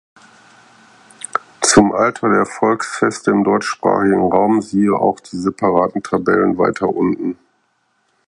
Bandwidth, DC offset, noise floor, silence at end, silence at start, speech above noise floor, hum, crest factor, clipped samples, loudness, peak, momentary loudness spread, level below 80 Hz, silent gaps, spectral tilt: 11.5 kHz; under 0.1%; -63 dBFS; 0.95 s; 1.35 s; 48 dB; none; 16 dB; under 0.1%; -16 LUFS; 0 dBFS; 10 LU; -50 dBFS; none; -4.5 dB/octave